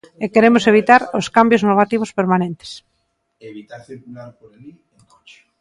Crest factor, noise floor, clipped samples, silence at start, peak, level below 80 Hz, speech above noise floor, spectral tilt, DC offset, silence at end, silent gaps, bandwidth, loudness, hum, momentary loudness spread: 18 dB; -69 dBFS; under 0.1%; 0.2 s; 0 dBFS; -58 dBFS; 52 dB; -6 dB/octave; under 0.1%; 0.9 s; none; 11.5 kHz; -14 LUFS; none; 25 LU